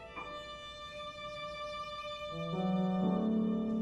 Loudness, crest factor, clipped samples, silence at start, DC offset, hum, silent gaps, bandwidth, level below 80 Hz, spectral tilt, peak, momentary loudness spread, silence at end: -37 LUFS; 14 dB; under 0.1%; 0 s; under 0.1%; none; none; 10 kHz; -62 dBFS; -7 dB/octave; -22 dBFS; 12 LU; 0 s